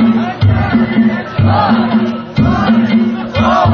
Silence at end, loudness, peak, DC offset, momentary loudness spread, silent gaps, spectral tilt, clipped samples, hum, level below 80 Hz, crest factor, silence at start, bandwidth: 0 s; -12 LUFS; 0 dBFS; under 0.1%; 4 LU; none; -8.5 dB/octave; under 0.1%; none; -28 dBFS; 10 dB; 0 s; 6.4 kHz